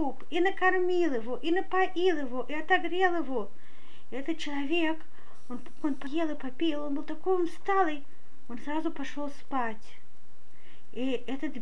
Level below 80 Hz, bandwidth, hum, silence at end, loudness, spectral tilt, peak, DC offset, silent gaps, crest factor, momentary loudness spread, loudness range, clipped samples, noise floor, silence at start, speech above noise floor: -70 dBFS; 11 kHz; none; 0 s; -30 LUFS; -5.5 dB/octave; -12 dBFS; 4%; none; 18 dB; 14 LU; 7 LU; under 0.1%; -63 dBFS; 0 s; 32 dB